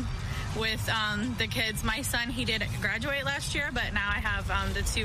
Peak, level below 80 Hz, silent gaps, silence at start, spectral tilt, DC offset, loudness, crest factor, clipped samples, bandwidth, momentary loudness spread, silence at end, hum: -14 dBFS; -38 dBFS; none; 0 s; -3.5 dB/octave; under 0.1%; -29 LUFS; 16 dB; under 0.1%; 15.5 kHz; 2 LU; 0 s; none